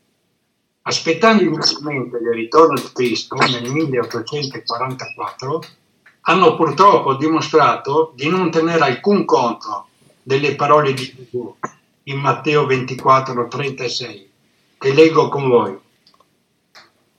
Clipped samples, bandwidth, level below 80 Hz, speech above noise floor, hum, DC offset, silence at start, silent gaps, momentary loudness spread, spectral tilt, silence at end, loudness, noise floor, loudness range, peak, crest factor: under 0.1%; 14 kHz; -64 dBFS; 52 dB; none; under 0.1%; 0.85 s; none; 14 LU; -5 dB/octave; 0.4 s; -16 LUFS; -68 dBFS; 4 LU; 0 dBFS; 18 dB